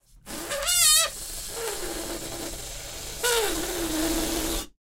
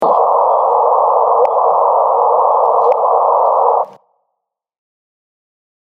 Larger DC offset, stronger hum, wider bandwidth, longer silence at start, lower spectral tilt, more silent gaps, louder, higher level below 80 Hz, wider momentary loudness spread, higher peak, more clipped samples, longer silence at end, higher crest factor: neither; neither; first, 16 kHz vs 4.7 kHz; first, 0.15 s vs 0 s; second, -1 dB/octave vs -7 dB/octave; neither; second, -25 LUFS vs -12 LUFS; first, -42 dBFS vs -76 dBFS; first, 17 LU vs 1 LU; second, -4 dBFS vs 0 dBFS; neither; second, 0.15 s vs 2 s; first, 24 dB vs 14 dB